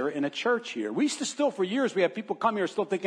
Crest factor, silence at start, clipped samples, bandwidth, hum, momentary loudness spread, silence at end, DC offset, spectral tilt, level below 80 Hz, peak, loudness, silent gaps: 16 dB; 0 s; under 0.1%; 10.5 kHz; none; 3 LU; 0 s; under 0.1%; -4 dB/octave; -86 dBFS; -10 dBFS; -28 LUFS; none